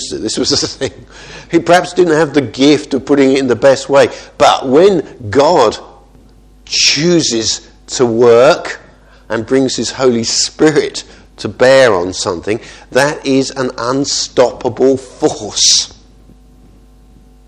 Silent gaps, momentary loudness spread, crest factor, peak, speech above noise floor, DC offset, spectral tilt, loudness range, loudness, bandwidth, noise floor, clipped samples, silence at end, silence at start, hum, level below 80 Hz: none; 13 LU; 12 dB; 0 dBFS; 31 dB; under 0.1%; -3.5 dB/octave; 3 LU; -11 LUFS; 12 kHz; -42 dBFS; 0.2%; 1.6 s; 0 s; none; -44 dBFS